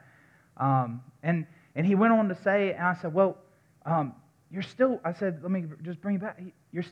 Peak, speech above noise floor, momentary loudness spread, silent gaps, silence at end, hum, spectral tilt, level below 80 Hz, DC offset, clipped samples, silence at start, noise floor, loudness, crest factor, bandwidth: -10 dBFS; 32 dB; 15 LU; none; 0 s; none; -9 dB/octave; -76 dBFS; under 0.1%; under 0.1%; 0.6 s; -60 dBFS; -28 LUFS; 18 dB; 7.2 kHz